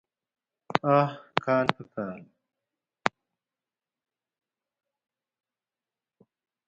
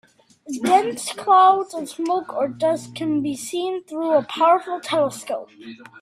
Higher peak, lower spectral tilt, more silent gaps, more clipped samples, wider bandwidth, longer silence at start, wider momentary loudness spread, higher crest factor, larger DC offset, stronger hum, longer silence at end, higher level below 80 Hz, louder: first, 0 dBFS vs -4 dBFS; first, -6.5 dB/octave vs -4 dB/octave; neither; neither; second, 9.2 kHz vs 15 kHz; first, 0.75 s vs 0.45 s; about the same, 13 LU vs 14 LU; first, 32 dB vs 18 dB; neither; neither; first, 3.6 s vs 0.2 s; about the same, -72 dBFS vs -68 dBFS; second, -28 LUFS vs -21 LUFS